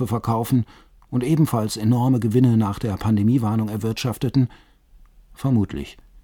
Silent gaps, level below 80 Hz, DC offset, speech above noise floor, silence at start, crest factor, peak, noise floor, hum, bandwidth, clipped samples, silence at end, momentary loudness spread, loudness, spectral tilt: none; -46 dBFS; under 0.1%; 31 dB; 0 s; 16 dB; -6 dBFS; -51 dBFS; none; 19.5 kHz; under 0.1%; 0.3 s; 10 LU; -21 LUFS; -7.5 dB/octave